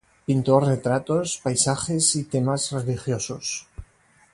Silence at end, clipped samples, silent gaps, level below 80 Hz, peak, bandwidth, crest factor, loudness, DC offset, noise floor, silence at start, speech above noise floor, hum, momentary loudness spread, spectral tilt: 0.5 s; under 0.1%; none; -52 dBFS; -4 dBFS; 11.5 kHz; 20 dB; -23 LUFS; under 0.1%; -58 dBFS; 0.3 s; 35 dB; none; 8 LU; -4.5 dB/octave